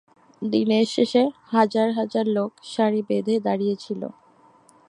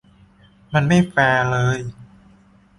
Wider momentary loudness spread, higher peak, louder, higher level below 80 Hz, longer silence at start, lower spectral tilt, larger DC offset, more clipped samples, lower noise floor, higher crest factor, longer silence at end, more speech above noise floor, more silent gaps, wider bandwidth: about the same, 10 LU vs 9 LU; about the same, -4 dBFS vs -4 dBFS; second, -23 LUFS vs -18 LUFS; second, -74 dBFS vs -48 dBFS; second, 0.4 s vs 0.7 s; about the same, -6 dB/octave vs -6.5 dB/octave; neither; neither; about the same, -55 dBFS vs -52 dBFS; about the same, 20 dB vs 18 dB; about the same, 0.75 s vs 0.75 s; about the same, 33 dB vs 34 dB; neither; about the same, 10.5 kHz vs 11.5 kHz